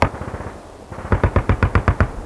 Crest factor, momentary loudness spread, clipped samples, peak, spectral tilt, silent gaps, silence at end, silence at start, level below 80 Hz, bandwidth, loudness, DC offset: 20 dB; 16 LU; under 0.1%; 0 dBFS; -7.5 dB/octave; none; 0 s; 0 s; -26 dBFS; 11 kHz; -20 LUFS; under 0.1%